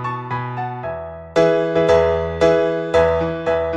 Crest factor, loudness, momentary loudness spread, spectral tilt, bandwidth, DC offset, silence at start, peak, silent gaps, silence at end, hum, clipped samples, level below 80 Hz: 16 dB; -18 LUFS; 11 LU; -6.5 dB/octave; 8.6 kHz; under 0.1%; 0 s; -2 dBFS; none; 0 s; none; under 0.1%; -40 dBFS